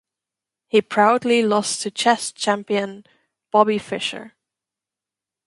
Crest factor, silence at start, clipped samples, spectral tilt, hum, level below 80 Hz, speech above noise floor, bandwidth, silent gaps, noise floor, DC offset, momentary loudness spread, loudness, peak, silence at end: 22 dB; 0.75 s; under 0.1%; -3.5 dB/octave; none; -70 dBFS; 69 dB; 11.5 kHz; none; -88 dBFS; under 0.1%; 9 LU; -20 LUFS; 0 dBFS; 1.2 s